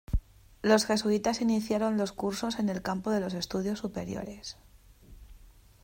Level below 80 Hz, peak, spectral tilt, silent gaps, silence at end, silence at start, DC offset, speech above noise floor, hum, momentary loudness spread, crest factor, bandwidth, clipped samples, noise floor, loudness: -46 dBFS; -10 dBFS; -5 dB/octave; none; 0.35 s; 0.1 s; under 0.1%; 25 dB; none; 12 LU; 20 dB; 16 kHz; under 0.1%; -55 dBFS; -30 LUFS